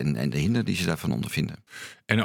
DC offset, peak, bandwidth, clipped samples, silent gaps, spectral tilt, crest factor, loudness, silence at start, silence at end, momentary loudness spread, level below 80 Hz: under 0.1%; -4 dBFS; 18.5 kHz; under 0.1%; none; -5.5 dB/octave; 22 dB; -27 LUFS; 0 s; 0 s; 15 LU; -50 dBFS